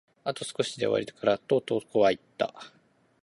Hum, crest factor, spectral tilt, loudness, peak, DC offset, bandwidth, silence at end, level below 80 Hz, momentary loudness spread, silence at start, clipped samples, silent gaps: none; 20 dB; -4.5 dB/octave; -28 LUFS; -8 dBFS; under 0.1%; 11.5 kHz; 0.55 s; -68 dBFS; 9 LU; 0.25 s; under 0.1%; none